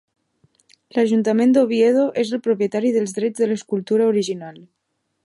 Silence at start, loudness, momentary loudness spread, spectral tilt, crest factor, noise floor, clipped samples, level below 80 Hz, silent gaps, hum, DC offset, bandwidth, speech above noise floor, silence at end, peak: 0.95 s; -19 LUFS; 9 LU; -6 dB/octave; 14 dB; -73 dBFS; under 0.1%; -72 dBFS; none; none; under 0.1%; 11.5 kHz; 55 dB; 0.65 s; -4 dBFS